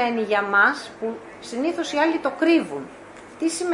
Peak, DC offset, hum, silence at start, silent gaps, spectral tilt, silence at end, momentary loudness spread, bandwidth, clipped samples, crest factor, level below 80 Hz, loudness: -6 dBFS; under 0.1%; none; 0 s; none; -3.5 dB/octave; 0 s; 18 LU; 11 kHz; under 0.1%; 18 dB; -66 dBFS; -22 LUFS